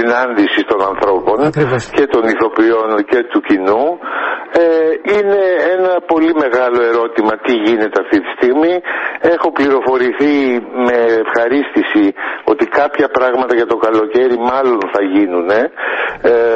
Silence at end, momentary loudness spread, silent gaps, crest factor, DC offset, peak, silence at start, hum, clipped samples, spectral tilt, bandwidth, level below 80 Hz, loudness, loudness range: 0 s; 3 LU; none; 12 dB; under 0.1%; 0 dBFS; 0 s; none; under 0.1%; -6.5 dB/octave; 8.4 kHz; -50 dBFS; -13 LUFS; 1 LU